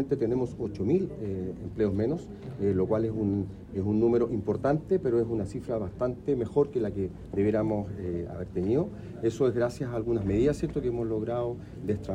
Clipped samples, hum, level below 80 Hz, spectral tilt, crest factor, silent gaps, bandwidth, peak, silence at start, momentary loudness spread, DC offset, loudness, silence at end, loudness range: under 0.1%; none; -50 dBFS; -9 dB/octave; 16 dB; none; 10 kHz; -12 dBFS; 0 s; 8 LU; under 0.1%; -29 LUFS; 0 s; 2 LU